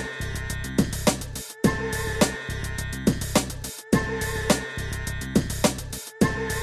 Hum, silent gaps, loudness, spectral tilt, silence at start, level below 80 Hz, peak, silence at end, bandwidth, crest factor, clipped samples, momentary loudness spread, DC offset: none; none; -26 LUFS; -4.5 dB/octave; 0 s; -36 dBFS; -4 dBFS; 0 s; 13.5 kHz; 22 dB; under 0.1%; 8 LU; 0.1%